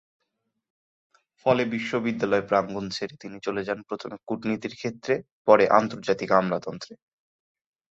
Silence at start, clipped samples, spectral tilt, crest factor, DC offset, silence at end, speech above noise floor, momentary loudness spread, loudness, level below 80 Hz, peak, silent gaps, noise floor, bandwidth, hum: 1.45 s; under 0.1%; -6 dB/octave; 24 dB; under 0.1%; 0.95 s; 54 dB; 14 LU; -25 LUFS; -64 dBFS; -2 dBFS; 5.32-5.45 s; -79 dBFS; 7.8 kHz; none